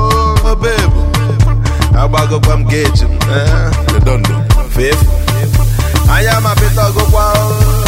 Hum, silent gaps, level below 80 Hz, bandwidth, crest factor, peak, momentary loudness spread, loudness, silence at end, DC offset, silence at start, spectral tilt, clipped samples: none; none; -12 dBFS; 16.5 kHz; 10 dB; 0 dBFS; 3 LU; -11 LUFS; 0 s; under 0.1%; 0 s; -5.5 dB/octave; 0.3%